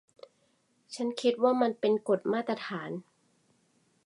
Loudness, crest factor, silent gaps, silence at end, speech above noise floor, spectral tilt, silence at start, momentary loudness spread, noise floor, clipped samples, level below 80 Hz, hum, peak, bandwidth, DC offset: -30 LUFS; 20 dB; none; 1.05 s; 42 dB; -5.5 dB/octave; 0.9 s; 14 LU; -71 dBFS; under 0.1%; -86 dBFS; none; -12 dBFS; 11 kHz; under 0.1%